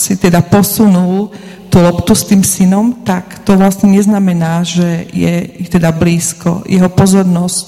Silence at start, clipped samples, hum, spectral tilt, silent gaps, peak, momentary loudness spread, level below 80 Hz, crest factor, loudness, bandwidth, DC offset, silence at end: 0 s; 0.4%; none; -5.5 dB/octave; none; 0 dBFS; 8 LU; -36 dBFS; 10 dB; -10 LUFS; 15.5 kHz; under 0.1%; 0 s